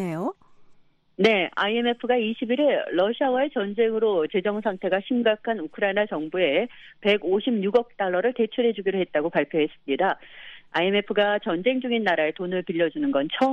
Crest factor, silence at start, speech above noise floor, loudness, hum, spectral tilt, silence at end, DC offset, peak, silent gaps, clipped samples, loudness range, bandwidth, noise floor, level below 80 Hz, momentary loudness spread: 18 dB; 0 s; 31 dB; -24 LUFS; none; -6.5 dB/octave; 0 s; under 0.1%; -6 dBFS; none; under 0.1%; 1 LU; 7.8 kHz; -54 dBFS; -68 dBFS; 5 LU